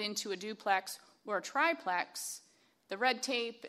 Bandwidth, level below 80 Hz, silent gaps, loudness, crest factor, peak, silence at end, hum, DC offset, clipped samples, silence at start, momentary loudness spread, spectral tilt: 15.5 kHz; -90 dBFS; none; -35 LUFS; 20 dB; -16 dBFS; 0 s; none; under 0.1%; under 0.1%; 0 s; 15 LU; -1.5 dB/octave